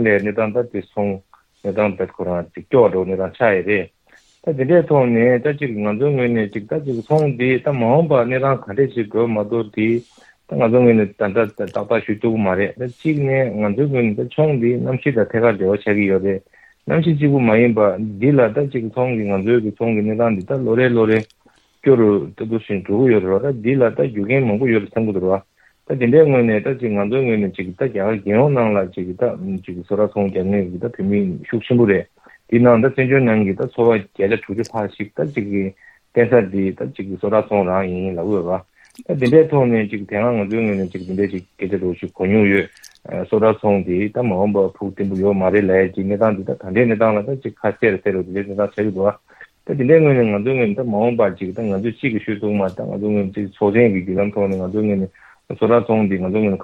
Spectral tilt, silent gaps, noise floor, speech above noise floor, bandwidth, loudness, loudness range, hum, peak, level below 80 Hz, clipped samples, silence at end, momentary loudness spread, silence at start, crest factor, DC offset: -9.5 dB/octave; none; -53 dBFS; 36 dB; 7.4 kHz; -18 LUFS; 3 LU; none; 0 dBFS; -56 dBFS; under 0.1%; 0 s; 10 LU; 0 s; 18 dB; under 0.1%